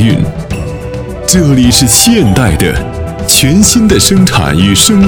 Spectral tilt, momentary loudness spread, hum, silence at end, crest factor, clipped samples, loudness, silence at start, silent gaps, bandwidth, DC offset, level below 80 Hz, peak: -4 dB/octave; 13 LU; none; 0 s; 8 dB; 1%; -7 LUFS; 0 s; none; over 20 kHz; under 0.1%; -22 dBFS; 0 dBFS